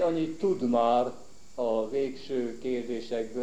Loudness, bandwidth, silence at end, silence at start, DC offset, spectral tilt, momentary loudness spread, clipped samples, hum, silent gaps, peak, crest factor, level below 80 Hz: -29 LUFS; 10 kHz; 0 s; 0 s; 0.7%; -6.5 dB/octave; 9 LU; under 0.1%; none; none; -12 dBFS; 16 dB; -62 dBFS